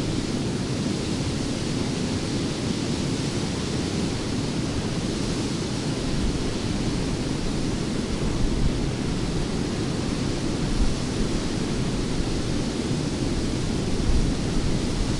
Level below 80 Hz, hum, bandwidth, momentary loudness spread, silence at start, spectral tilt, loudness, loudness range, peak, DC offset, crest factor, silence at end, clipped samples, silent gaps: -32 dBFS; none; 11.5 kHz; 1 LU; 0 s; -5.5 dB/octave; -26 LUFS; 0 LU; -10 dBFS; under 0.1%; 16 dB; 0 s; under 0.1%; none